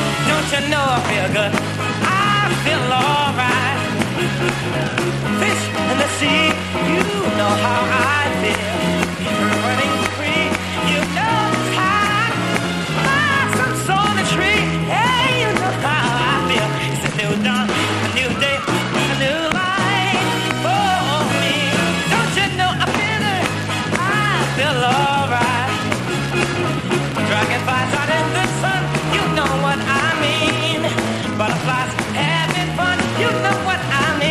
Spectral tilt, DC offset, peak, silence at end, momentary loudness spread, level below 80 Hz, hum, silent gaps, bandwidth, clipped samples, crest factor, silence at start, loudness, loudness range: -4.5 dB/octave; under 0.1%; 0 dBFS; 0 s; 4 LU; -44 dBFS; none; none; 14.5 kHz; under 0.1%; 18 dB; 0 s; -17 LUFS; 2 LU